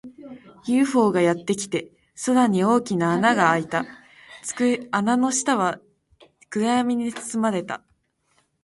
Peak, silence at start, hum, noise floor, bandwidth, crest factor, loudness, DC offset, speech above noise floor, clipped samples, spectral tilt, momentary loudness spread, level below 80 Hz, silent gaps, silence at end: -4 dBFS; 0.05 s; none; -67 dBFS; 11.5 kHz; 18 dB; -22 LUFS; under 0.1%; 46 dB; under 0.1%; -4.5 dB/octave; 16 LU; -64 dBFS; none; 0.85 s